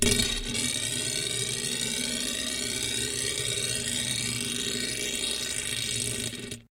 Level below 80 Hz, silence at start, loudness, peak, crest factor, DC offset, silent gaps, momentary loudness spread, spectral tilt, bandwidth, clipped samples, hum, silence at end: -46 dBFS; 0 s; -28 LUFS; -8 dBFS; 22 dB; under 0.1%; none; 2 LU; -1.5 dB/octave; 17 kHz; under 0.1%; none; 0.1 s